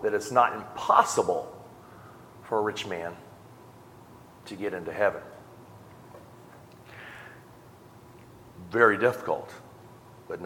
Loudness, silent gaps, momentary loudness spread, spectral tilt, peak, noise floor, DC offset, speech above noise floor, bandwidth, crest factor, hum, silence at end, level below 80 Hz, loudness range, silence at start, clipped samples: -26 LUFS; none; 27 LU; -4 dB/octave; -4 dBFS; -51 dBFS; under 0.1%; 25 dB; 18 kHz; 26 dB; none; 0 s; -68 dBFS; 11 LU; 0 s; under 0.1%